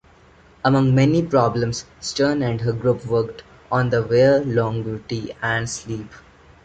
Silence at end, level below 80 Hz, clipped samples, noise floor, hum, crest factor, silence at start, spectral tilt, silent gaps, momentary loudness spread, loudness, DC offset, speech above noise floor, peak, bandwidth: 0.45 s; -48 dBFS; under 0.1%; -51 dBFS; none; 18 dB; 0.65 s; -6 dB/octave; none; 12 LU; -20 LUFS; under 0.1%; 31 dB; -2 dBFS; 9.2 kHz